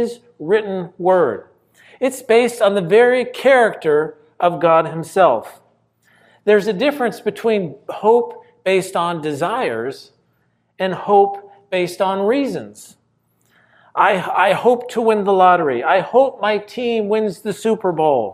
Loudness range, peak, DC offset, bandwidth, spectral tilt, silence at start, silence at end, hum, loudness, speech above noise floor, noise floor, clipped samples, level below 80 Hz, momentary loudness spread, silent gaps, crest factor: 5 LU; 0 dBFS; under 0.1%; 15 kHz; -5.5 dB/octave; 0 s; 0 s; none; -17 LUFS; 47 dB; -63 dBFS; under 0.1%; -70 dBFS; 11 LU; none; 16 dB